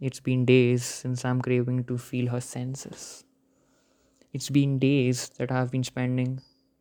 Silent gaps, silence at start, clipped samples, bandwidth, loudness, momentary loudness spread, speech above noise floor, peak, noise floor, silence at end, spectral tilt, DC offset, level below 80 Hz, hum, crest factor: none; 0 s; under 0.1%; 19 kHz; -26 LUFS; 16 LU; 40 dB; -6 dBFS; -66 dBFS; 0.4 s; -6 dB/octave; under 0.1%; -64 dBFS; none; 20 dB